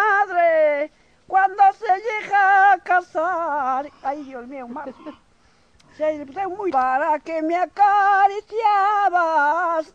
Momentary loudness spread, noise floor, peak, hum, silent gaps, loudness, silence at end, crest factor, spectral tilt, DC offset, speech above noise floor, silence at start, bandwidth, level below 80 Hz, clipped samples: 14 LU; -58 dBFS; -6 dBFS; none; none; -19 LUFS; 0.1 s; 14 dB; -3.5 dB/octave; under 0.1%; 37 dB; 0 s; 7.8 kHz; -64 dBFS; under 0.1%